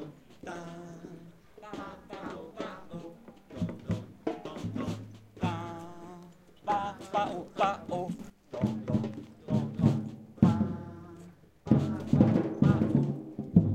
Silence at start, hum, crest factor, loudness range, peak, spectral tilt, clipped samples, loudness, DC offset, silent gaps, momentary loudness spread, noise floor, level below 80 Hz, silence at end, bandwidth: 0 s; none; 24 dB; 13 LU; -6 dBFS; -8.5 dB/octave; under 0.1%; -31 LUFS; under 0.1%; none; 22 LU; -53 dBFS; -56 dBFS; 0 s; 9.2 kHz